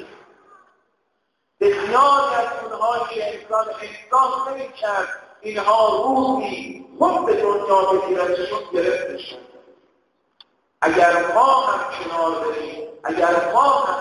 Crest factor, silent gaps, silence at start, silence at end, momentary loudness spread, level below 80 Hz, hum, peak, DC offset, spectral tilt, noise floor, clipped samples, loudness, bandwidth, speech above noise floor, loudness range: 18 dB; none; 0 s; 0 s; 14 LU; -60 dBFS; none; -4 dBFS; under 0.1%; -4 dB/octave; -72 dBFS; under 0.1%; -19 LUFS; 11.5 kHz; 53 dB; 3 LU